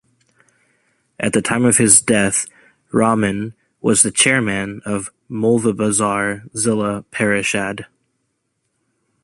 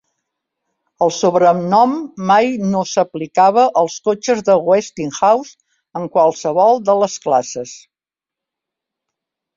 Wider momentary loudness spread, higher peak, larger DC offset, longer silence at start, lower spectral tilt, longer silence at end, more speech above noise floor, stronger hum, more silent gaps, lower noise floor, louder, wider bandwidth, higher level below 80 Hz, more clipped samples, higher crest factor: first, 14 LU vs 8 LU; about the same, 0 dBFS vs -2 dBFS; neither; first, 1.2 s vs 1 s; second, -3.5 dB/octave vs -5 dB/octave; second, 1.4 s vs 1.8 s; second, 54 dB vs 73 dB; neither; neither; second, -71 dBFS vs -88 dBFS; about the same, -16 LUFS vs -15 LUFS; first, 12.5 kHz vs 7.6 kHz; first, -52 dBFS vs -62 dBFS; neither; about the same, 18 dB vs 14 dB